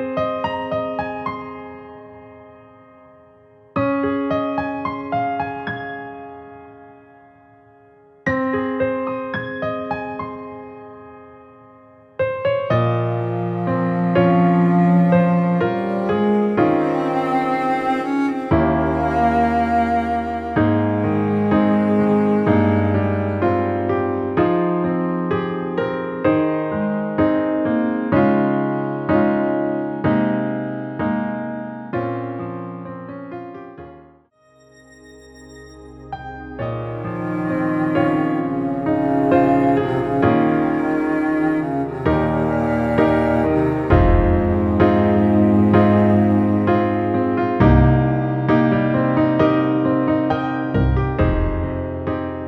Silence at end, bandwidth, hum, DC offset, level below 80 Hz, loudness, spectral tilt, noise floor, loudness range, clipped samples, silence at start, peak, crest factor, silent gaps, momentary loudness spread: 0 s; 7.6 kHz; none; under 0.1%; -34 dBFS; -19 LUFS; -9.5 dB/octave; -54 dBFS; 13 LU; under 0.1%; 0 s; -2 dBFS; 16 dB; none; 13 LU